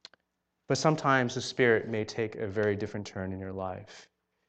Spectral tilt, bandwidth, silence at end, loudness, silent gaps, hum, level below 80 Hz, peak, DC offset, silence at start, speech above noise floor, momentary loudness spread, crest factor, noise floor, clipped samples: -5 dB/octave; 9 kHz; 0.45 s; -30 LUFS; none; none; -68 dBFS; -10 dBFS; under 0.1%; 0.7 s; 51 dB; 12 LU; 22 dB; -81 dBFS; under 0.1%